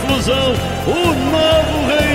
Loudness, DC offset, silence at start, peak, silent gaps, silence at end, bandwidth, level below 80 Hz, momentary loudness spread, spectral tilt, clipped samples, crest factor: -15 LUFS; 0.4%; 0 s; -4 dBFS; none; 0 s; 16.5 kHz; -28 dBFS; 4 LU; -5 dB/octave; under 0.1%; 12 dB